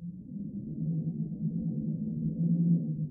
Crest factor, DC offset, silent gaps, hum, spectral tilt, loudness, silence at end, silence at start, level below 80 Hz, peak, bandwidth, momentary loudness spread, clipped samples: 14 dB; under 0.1%; none; none; -18.5 dB/octave; -32 LUFS; 0 s; 0 s; -60 dBFS; -16 dBFS; 0.8 kHz; 12 LU; under 0.1%